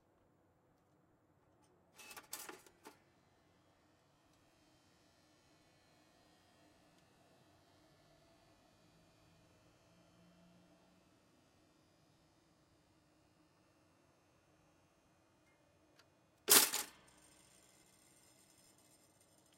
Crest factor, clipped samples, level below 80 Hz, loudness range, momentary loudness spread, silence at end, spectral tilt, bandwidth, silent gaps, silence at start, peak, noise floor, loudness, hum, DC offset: 34 dB; under 0.1%; -86 dBFS; 21 LU; 29 LU; 2.7 s; 0.5 dB/octave; 16 kHz; none; 2.15 s; -12 dBFS; -74 dBFS; -32 LUFS; none; under 0.1%